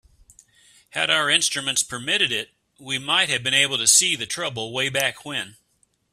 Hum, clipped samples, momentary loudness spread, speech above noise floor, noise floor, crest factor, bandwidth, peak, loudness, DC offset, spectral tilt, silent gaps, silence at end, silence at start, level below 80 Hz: none; under 0.1%; 14 LU; 44 dB; -67 dBFS; 22 dB; 15.5 kHz; -2 dBFS; -20 LUFS; under 0.1%; -0.5 dB/octave; none; 0.65 s; 0.95 s; -64 dBFS